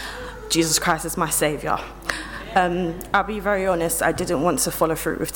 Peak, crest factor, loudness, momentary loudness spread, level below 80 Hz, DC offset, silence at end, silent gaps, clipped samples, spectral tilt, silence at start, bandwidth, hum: -6 dBFS; 18 dB; -22 LUFS; 9 LU; -42 dBFS; under 0.1%; 0 s; none; under 0.1%; -3.5 dB/octave; 0 s; 17.5 kHz; none